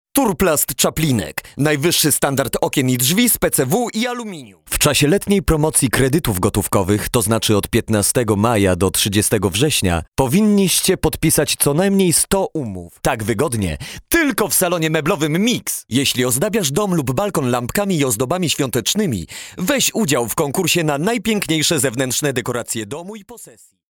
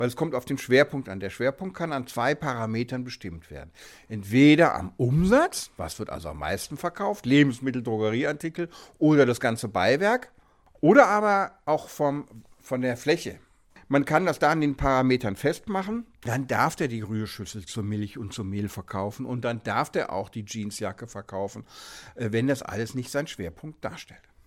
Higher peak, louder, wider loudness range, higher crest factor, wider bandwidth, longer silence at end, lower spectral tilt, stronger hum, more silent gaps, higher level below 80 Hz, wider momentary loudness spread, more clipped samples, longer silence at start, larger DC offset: about the same, 0 dBFS vs -2 dBFS; first, -17 LUFS vs -25 LUFS; second, 3 LU vs 8 LU; about the same, 18 dB vs 22 dB; first, over 20 kHz vs 16.5 kHz; about the same, 0.4 s vs 0.35 s; second, -4 dB/octave vs -6 dB/octave; neither; first, 10.08-10.12 s vs none; first, -38 dBFS vs -50 dBFS; second, 8 LU vs 16 LU; neither; first, 0.15 s vs 0 s; neither